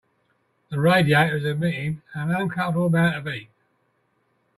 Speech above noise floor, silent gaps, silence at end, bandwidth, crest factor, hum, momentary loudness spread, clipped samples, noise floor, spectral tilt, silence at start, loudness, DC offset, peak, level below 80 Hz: 47 dB; none; 1.15 s; 13.5 kHz; 18 dB; none; 12 LU; under 0.1%; -68 dBFS; -7 dB/octave; 0.7 s; -22 LUFS; under 0.1%; -6 dBFS; -60 dBFS